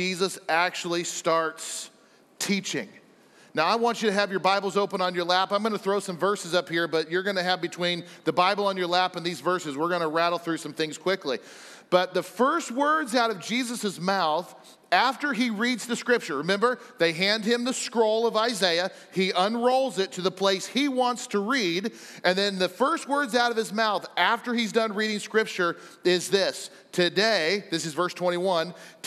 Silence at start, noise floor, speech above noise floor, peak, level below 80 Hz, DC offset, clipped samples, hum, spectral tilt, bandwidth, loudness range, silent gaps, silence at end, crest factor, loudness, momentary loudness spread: 0 s; -55 dBFS; 30 dB; -6 dBFS; -82 dBFS; under 0.1%; under 0.1%; none; -3.5 dB/octave; 15 kHz; 2 LU; none; 0 s; 20 dB; -25 LUFS; 6 LU